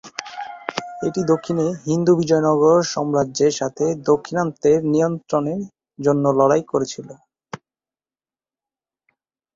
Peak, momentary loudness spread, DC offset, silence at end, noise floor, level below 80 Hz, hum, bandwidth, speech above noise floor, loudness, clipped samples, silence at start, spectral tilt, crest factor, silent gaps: -2 dBFS; 16 LU; under 0.1%; 2 s; under -90 dBFS; -58 dBFS; none; 7.8 kHz; over 72 dB; -19 LUFS; under 0.1%; 0.05 s; -6 dB/octave; 18 dB; none